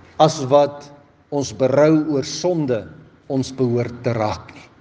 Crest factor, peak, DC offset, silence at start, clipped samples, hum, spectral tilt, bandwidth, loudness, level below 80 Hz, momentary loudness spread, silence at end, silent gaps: 20 dB; 0 dBFS; under 0.1%; 0.2 s; under 0.1%; none; -6 dB/octave; 9.6 kHz; -19 LUFS; -58 dBFS; 11 LU; 0.2 s; none